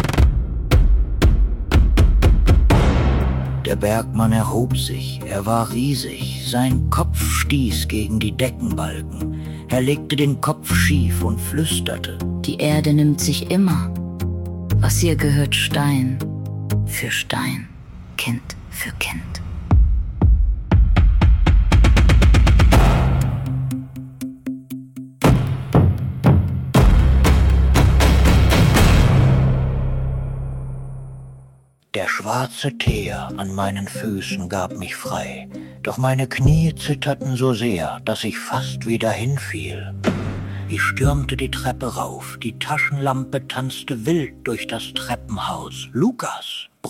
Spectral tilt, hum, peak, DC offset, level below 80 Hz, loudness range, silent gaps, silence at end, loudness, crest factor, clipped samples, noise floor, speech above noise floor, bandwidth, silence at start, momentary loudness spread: -5.5 dB/octave; none; -4 dBFS; under 0.1%; -22 dBFS; 9 LU; none; 0 s; -19 LUFS; 14 dB; under 0.1%; -50 dBFS; 29 dB; 17 kHz; 0 s; 13 LU